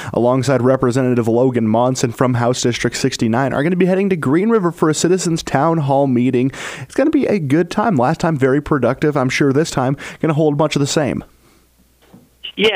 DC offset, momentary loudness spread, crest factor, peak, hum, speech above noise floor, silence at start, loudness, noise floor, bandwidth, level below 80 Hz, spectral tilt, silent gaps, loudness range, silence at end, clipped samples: under 0.1%; 4 LU; 14 dB; -2 dBFS; none; 38 dB; 0 s; -16 LUFS; -53 dBFS; 16 kHz; -46 dBFS; -5.5 dB/octave; none; 2 LU; 0 s; under 0.1%